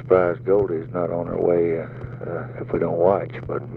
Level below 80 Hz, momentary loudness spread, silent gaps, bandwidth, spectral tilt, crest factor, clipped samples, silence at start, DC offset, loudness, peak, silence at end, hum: -48 dBFS; 12 LU; none; 4.2 kHz; -11 dB/octave; 18 dB; under 0.1%; 0 s; under 0.1%; -22 LUFS; -4 dBFS; 0 s; none